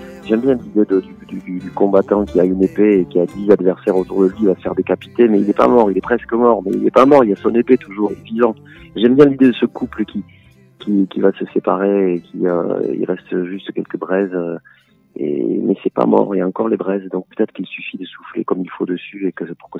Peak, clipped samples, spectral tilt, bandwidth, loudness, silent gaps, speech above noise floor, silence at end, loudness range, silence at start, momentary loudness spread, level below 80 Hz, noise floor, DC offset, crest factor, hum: 0 dBFS; under 0.1%; -8.5 dB/octave; 7.2 kHz; -16 LUFS; none; 27 dB; 0 s; 7 LU; 0 s; 14 LU; -50 dBFS; -42 dBFS; under 0.1%; 16 dB; none